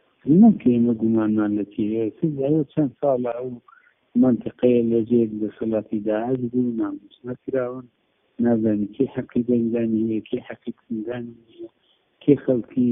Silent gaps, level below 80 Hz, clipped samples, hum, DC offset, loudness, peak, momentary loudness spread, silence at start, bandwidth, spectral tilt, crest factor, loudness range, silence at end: none; -60 dBFS; under 0.1%; none; under 0.1%; -22 LUFS; -4 dBFS; 15 LU; 0.25 s; 3.7 kHz; -8 dB/octave; 18 dB; 4 LU; 0 s